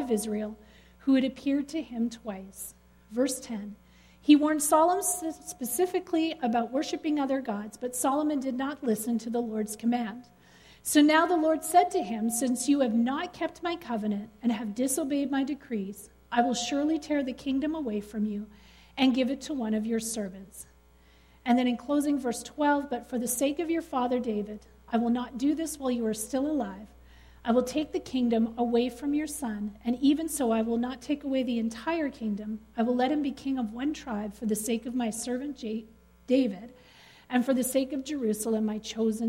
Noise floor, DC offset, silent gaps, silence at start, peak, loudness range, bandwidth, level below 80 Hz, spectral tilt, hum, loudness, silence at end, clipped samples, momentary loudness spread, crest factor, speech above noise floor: -58 dBFS; under 0.1%; none; 0 s; -8 dBFS; 5 LU; 16 kHz; -60 dBFS; -4 dB/octave; none; -29 LUFS; 0 s; under 0.1%; 11 LU; 20 dB; 30 dB